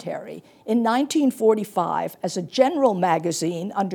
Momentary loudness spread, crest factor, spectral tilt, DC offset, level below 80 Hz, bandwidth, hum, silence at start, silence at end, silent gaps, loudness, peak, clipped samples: 11 LU; 18 dB; -5 dB/octave; under 0.1%; -78 dBFS; 19.5 kHz; none; 0 s; 0 s; none; -22 LUFS; -4 dBFS; under 0.1%